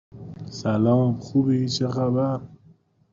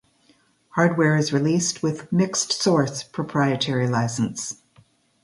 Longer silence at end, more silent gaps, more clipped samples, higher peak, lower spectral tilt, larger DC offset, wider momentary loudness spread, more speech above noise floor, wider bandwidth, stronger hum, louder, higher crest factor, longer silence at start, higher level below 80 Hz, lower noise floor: second, 0.55 s vs 0.7 s; neither; neither; second, -10 dBFS vs -4 dBFS; first, -7.5 dB/octave vs -4.5 dB/octave; neither; first, 15 LU vs 10 LU; second, 34 dB vs 39 dB; second, 7.6 kHz vs 11.5 kHz; neither; about the same, -23 LUFS vs -22 LUFS; about the same, 14 dB vs 18 dB; second, 0.15 s vs 0.75 s; about the same, -58 dBFS vs -62 dBFS; second, -56 dBFS vs -61 dBFS